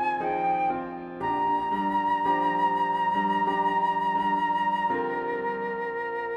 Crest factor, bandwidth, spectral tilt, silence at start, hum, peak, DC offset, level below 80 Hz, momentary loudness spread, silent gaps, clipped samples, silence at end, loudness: 12 dB; 8.4 kHz; -6.5 dB/octave; 0 s; none; -14 dBFS; under 0.1%; -62 dBFS; 6 LU; none; under 0.1%; 0 s; -26 LUFS